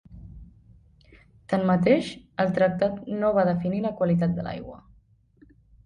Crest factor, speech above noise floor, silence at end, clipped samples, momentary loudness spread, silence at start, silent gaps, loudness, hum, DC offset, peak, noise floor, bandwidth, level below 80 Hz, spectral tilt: 18 dB; 36 dB; 1.1 s; under 0.1%; 14 LU; 0.1 s; none; -24 LUFS; none; under 0.1%; -8 dBFS; -59 dBFS; 10 kHz; -54 dBFS; -8 dB/octave